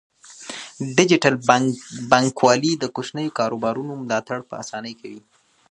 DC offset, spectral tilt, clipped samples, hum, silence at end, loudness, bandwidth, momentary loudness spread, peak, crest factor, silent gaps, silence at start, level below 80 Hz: under 0.1%; -4.5 dB/octave; under 0.1%; none; 0.5 s; -20 LUFS; 11 kHz; 17 LU; 0 dBFS; 22 dB; none; 0.3 s; -64 dBFS